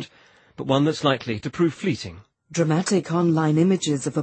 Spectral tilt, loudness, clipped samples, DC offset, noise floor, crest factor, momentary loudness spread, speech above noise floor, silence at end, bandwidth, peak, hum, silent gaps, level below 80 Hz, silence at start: -6 dB/octave; -22 LUFS; under 0.1%; under 0.1%; -55 dBFS; 18 dB; 11 LU; 33 dB; 0 s; 8.8 kHz; -4 dBFS; none; none; -60 dBFS; 0 s